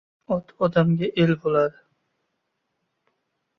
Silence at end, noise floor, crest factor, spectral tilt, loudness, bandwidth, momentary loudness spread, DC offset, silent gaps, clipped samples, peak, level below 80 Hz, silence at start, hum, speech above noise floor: 1.9 s; -77 dBFS; 18 dB; -9 dB/octave; -23 LUFS; 6 kHz; 8 LU; under 0.1%; none; under 0.1%; -6 dBFS; -58 dBFS; 0.3 s; none; 55 dB